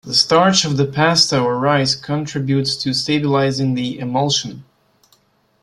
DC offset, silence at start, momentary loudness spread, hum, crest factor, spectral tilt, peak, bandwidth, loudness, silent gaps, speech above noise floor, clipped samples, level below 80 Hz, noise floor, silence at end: under 0.1%; 0.05 s; 8 LU; none; 18 dB; -4 dB/octave; 0 dBFS; 12.5 kHz; -16 LUFS; none; 41 dB; under 0.1%; -54 dBFS; -58 dBFS; 1 s